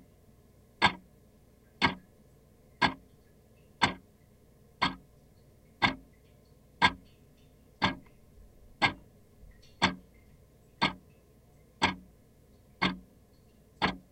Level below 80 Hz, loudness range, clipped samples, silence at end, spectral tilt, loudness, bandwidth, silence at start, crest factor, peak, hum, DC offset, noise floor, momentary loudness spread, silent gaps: -58 dBFS; 2 LU; under 0.1%; 0.1 s; -4 dB/octave; -31 LUFS; 16 kHz; 0.8 s; 30 dB; -6 dBFS; none; under 0.1%; -61 dBFS; 21 LU; none